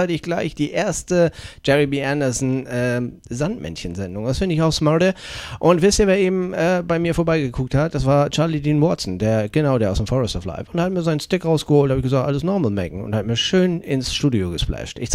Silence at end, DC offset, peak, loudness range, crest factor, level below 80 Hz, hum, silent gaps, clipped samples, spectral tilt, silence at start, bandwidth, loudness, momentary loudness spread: 0 s; under 0.1%; -2 dBFS; 3 LU; 18 dB; -38 dBFS; none; none; under 0.1%; -5.5 dB/octave; 0 s; 14.5 kHz; -20 LUFS; 9 LU